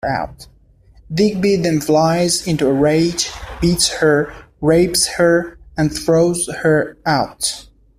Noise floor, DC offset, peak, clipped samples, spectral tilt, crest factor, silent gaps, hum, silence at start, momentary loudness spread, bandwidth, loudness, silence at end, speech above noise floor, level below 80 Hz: -48 dBFS; under 0.1%; -2 dBFS; under 0.1%; -4.5 dB/octave; 14 dB; none; none; 0.05 s; 8 LU; 16 kHz; -16 LUFS; 0.35 s; 32 dB; -40 dBFS